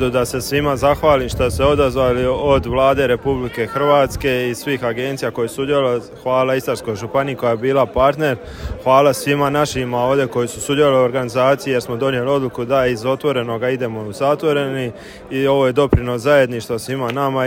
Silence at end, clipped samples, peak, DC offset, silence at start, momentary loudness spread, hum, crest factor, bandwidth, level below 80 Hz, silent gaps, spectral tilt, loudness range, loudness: 0 s; under 0.1%; 0 dBFS; under 0.1%; 0 s; 7 LU; none; 16 dB; 16.5 kHz; -36 dBFS; none; -5.5 dB/octave; 3 LU; -17 LUFS